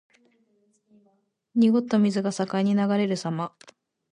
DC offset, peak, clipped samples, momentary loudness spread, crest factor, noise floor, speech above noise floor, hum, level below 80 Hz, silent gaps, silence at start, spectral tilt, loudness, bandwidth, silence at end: under 0.1%; -10 dBFS; under 0.1%; 9 LU; 16 dB; -68 dBFS; 45 dB; none; -72 dBFS; none; 1.55 s; -6.5 dB/octave; -24 LUFS; 10.5 kHz; 0.65 s